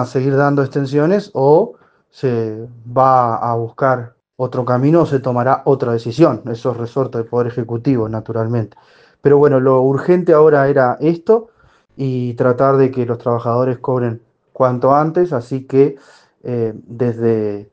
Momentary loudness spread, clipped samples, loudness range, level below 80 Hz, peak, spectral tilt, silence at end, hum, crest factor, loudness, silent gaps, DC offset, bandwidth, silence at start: 10 LU; under 0.1%; 4 LU; -56 dBFS; 0 dBFS; -9 dB/octave; 0.1 s; none; 16 dB; -15 LUFS; none; under 0.1%; 7.8 kHz; 0 s